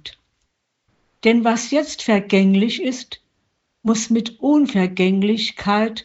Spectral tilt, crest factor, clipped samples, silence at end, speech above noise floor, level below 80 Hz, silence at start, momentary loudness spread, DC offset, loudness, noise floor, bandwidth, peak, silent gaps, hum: -4.5 dB/octave; 18 dB; under 0.1%; 0.05 s; 54 dB; -58 dBFS; 0.05 s; 10 LU; under 0.1%; -18 LUFS; -71 dBFS; 8 kHz; -2 dBFS; none; none